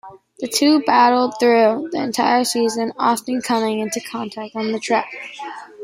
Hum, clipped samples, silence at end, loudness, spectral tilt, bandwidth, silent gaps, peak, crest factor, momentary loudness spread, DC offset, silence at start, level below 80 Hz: none; under 0.1%; 0 s; -18 LUFS; -3 dB/octave; 16 kHz; none; -2 dBFS; 16 dB; 16 LU; under 0.1%; 0.05 s; -68 dBFS